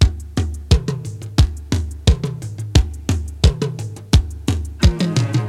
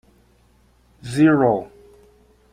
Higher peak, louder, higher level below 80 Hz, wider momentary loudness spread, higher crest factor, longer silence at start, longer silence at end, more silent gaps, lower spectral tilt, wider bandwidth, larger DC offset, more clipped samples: first, 0 dBFS vs -4 dBFS; about the same, -20 LUFS vs -18 LUFS; first, -22 dBFS vs -56 dBFS; second, 7 LU vs 25 LU; about the same, 18 dB vs 18 dB; second, 0 s vs 1.05 s; second, 0 s vs 0.85 s; neither; second, -6 dB/octave vs -7.5 dB/octave; first, 13.5 kHz vs 11 kHz; neither; neither